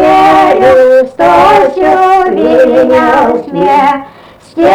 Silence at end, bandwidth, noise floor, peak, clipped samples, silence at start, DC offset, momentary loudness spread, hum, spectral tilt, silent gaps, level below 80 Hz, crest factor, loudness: 0 s; 13.5 kHz; -35 dBFS; 0 dBFS; 0.5%; 0 s; under 0.1%; 6 LU; none; -5.5 dB/octave; none; -38 dBFS; 6 dB; -6 LUFS